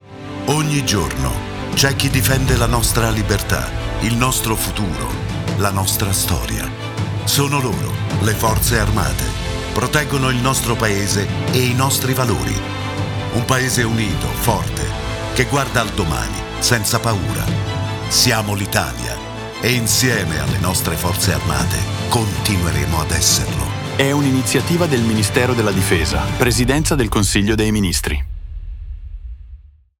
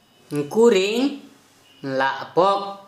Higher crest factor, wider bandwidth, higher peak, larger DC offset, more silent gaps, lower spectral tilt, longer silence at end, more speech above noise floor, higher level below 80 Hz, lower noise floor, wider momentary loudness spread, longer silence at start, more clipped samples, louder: about the same, 16 dB vs 18 dB; first, over 20 kHz vs 13.5 kHz; about the same, -2 dBFS vs -4 dBFS; neither; neither; about the same, -4 dB/octave vs -4.5 dB/octave; first, 0.45 s vs 0.05 s; second, 23 dB vs 33 dB; first, -28 dBFS vs -72 dBFS; second, -40 dBFS vs -53 dBFS; second, 8 LU vs 14 LU; second, 0.05 s vs 0.3 s; neither; first, -17 LUFS vs -20 LUFS